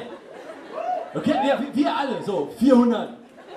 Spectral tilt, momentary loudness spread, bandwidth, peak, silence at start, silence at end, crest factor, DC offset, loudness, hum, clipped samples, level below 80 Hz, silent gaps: -6 dB/octave; 21 LU; 13 kHz; -4 dBFS; 0 s; 0 s; 20 dB; under 0.1%; -22 LUFS; none; under 0.1%; -62 dBFS; none